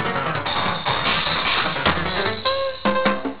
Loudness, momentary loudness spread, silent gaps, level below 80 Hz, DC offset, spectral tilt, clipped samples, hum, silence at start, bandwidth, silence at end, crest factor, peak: -20 LUFS; 4 LU; none; -42 dBFS; 2%; -8.5 dB/octave; under 0.1%; none; 0 s; 4 kHz; 0 s; 18 dB; -4 dBFS